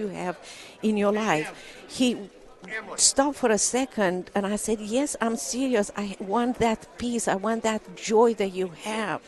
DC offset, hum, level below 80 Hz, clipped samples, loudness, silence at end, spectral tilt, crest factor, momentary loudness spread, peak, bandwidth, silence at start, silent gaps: under 0.1%; none; -56 dBFS; under 0.1%; -25 LUFS; 0.1 s; -3 dB/octave; 20 dB; 13 LU; -6 dBFS; 12 kHz; 0 s; none